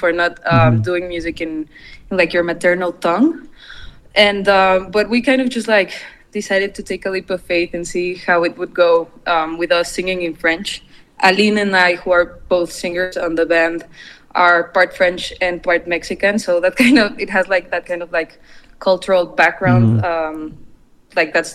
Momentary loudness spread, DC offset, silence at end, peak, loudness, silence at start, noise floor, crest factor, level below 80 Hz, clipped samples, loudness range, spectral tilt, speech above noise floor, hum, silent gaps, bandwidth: 10 LU; under 0.1%; 0 s; 0 dBFS; -16 LUFS; 0 s; -44 dBFS; 16 dB; -44 dBFS; under 0.1%; 3 LU; -5.5 dB/octave; 28 dB; none; none; 13 kHz